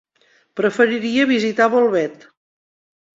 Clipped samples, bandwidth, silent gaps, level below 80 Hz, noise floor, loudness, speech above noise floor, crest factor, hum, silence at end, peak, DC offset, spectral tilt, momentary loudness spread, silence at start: under 0.1%; 7.8 kHz; none; -66 dBFS; -59 dBFS; -17 LUFS; 42 dB; 18 dB; none; 1 s; -2 dBFS; under 0.1%; -5 dB/octave; 8 LU; 0.55 s